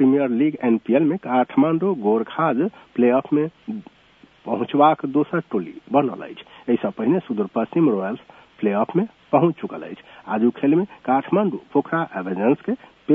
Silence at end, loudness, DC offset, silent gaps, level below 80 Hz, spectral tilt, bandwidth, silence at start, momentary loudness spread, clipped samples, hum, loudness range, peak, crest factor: 0 s; -21 LUFS; under 0.1%; none; -68 dBFS; -10 dB/octave; 3.8 kHz; 0 s; 12 LU; under 0.1%; none; 3 LU; -2 dBFS; 18 dB